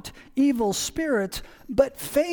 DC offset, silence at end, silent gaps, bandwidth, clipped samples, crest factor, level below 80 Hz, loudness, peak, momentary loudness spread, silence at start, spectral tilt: under 0.1%; 0 s; none; 19 kHz; under 0.1%; 20 dB; -48 dBFS; -25 LUFS; -4 dBFS; 10 LU; 0.05 s; -4 dB/octave